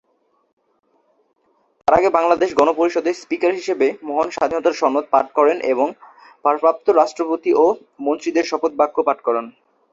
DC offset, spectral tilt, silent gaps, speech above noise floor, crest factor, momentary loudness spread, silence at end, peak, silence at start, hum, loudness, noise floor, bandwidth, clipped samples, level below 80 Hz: under 0.1%; -4.5 dB/octave; none; 47 dB; 18 dB; 7 LU; 0.45 s; 0 dBFS; 1.85 s; none; -18 LUFS; -64 dBFS; 7.8 kHz; under 0.1%; -58 dBFS